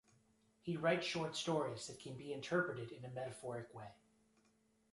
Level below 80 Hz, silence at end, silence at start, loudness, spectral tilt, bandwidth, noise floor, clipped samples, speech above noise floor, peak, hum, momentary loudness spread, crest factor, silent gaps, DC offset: -78 dBFS; 1 s; 0.65 s; -42 LUFS; -4.5 dB/octave; 11.5 kHz; -76 dBFS; under 0.1%; 34 dB; -24 dBFS; none; 14 LU; 20 dB; none; under 0.1%